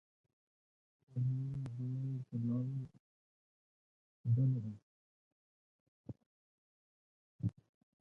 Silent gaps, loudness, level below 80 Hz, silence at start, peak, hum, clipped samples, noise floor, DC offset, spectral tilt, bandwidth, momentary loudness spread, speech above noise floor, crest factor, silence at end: 3.00-4.24 s, 4.83-6.04 s, 6.26-7.39 s; -39 LUFS; -72 dBFS; 1.1 s; -24 dBFS; none; under 0.1%; under -90 dBFS; under 0.1%; -11.5 dB/octave; 2.2 kHz; 21 LU; over 54 dB; 18 dB; 0.5 s